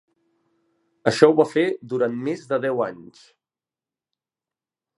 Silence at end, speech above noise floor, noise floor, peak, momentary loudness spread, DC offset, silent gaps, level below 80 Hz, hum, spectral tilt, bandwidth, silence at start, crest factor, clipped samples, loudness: 1.95 s; over 69 dB; under -90 dBFS; 0 dBFS; 10 LU; under 0.1%; none; -70 dBFS; none; -6 dB/octave; 11.5 kHz; 1.05 s; 24 dB; under 0.1%; -21 LUFS